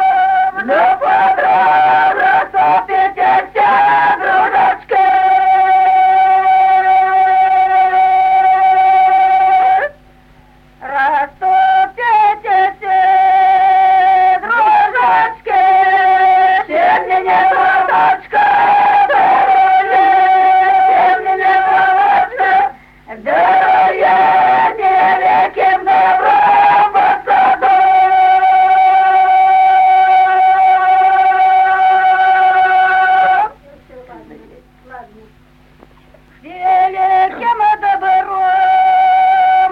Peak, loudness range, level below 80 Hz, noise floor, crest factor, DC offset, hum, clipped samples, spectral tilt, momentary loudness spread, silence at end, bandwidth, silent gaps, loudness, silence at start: -2 dBFS; 5 LU; -50 dBFS; -46 dBFS; 10 dB; under 0.1%; none; under 0.1%; -4.5 dB/octave; 4 LU; 0 s; 5.2 kHz; none; -10 LUFS; 0 s